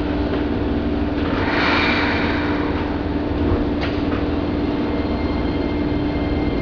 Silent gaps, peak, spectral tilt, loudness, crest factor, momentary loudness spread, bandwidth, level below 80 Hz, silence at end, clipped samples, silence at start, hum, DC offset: none; -6 dBFS; -7.5 dB/octave; -20 LUFS; 14 dB; 5 LU; 5.4 kHz; -28 dBFS; 0 s; under 0.1%; 0 s; none; under 0.1%